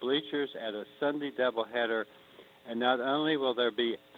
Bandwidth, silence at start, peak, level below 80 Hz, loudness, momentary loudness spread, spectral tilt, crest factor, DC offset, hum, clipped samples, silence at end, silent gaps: 16 kHz; 0 s; -12 dBFS; -80 dBFS; -31 LUFS; 10 LU; -6 dB/octave; 18 dB; under 0.1%; none; under 0.1%; 0 s; none